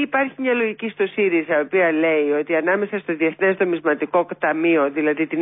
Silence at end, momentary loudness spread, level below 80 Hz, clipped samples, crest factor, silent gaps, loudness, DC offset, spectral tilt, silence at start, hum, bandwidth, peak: 0 s; 4 LU; -72 dBFS; under 0.1%; 12 dB; none; -20 LUFS; under 0.1%; -10.5 dB/octave; 0 s; none; 3.9 kHz; -8 dBFS